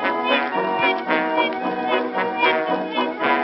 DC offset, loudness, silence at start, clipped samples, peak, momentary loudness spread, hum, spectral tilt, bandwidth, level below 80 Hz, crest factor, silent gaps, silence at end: under 0.1%; -20 LUFS; 0 s; under 0.1%; -4 dBFS; 4 LU; none; -8.5 dB/octave; 5.8 kHz; -68 dBFS; 18 dB; none; 0 s